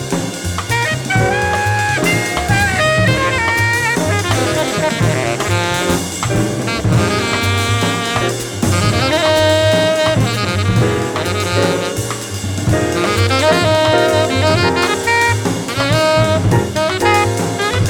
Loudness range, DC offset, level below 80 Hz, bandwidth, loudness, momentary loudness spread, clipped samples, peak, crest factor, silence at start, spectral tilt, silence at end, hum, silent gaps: 2 LU; under 0.1%; -36 dBFS; 18.5 kHz; -14 LUFS; 5 LU; under 0.1%; 0 dBFS; 14 dB; 0 s; -4.5 dB/octave; 0 s; none; none